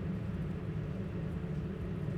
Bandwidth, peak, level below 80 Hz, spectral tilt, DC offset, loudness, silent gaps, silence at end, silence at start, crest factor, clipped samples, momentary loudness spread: 8.4 kHz; -26 dBFS; -48 dBFS; -9.5 dB/octave; under 0.1%; -39 LUFS; none; 0 s; 0 s; 10 dB; under 0.1%; 1 LU